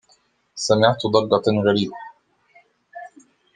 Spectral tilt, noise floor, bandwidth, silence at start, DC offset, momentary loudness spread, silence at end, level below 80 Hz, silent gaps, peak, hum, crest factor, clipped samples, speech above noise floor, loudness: -5 dB/octave; -61 dBFS; 9.8 kHz; 0.55 s; under 0.1%; 23 LU; 0.5 s; -64 dBFS; none; -2 dBFS; none; 20 dB; under 0.1%; 43 dB; -19 LUFS